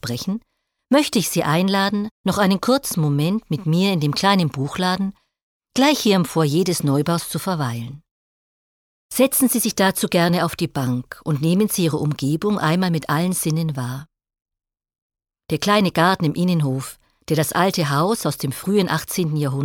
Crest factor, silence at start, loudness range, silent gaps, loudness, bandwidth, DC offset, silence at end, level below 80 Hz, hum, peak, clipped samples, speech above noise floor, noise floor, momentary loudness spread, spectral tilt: 16 dB; 0.05 s; 3 LU; 2.11-2.24 s, 5.42-5.60 s, 8.11-9.09 s, 15.02-15.10 s; -20 LUFS; 19 kHz; under 0.1%; 0 s; -54 dBFS; none; -4 dBFS; under 0.1%; over 71 dB; under -90 dBFS; 9 LU; -5 dB/octave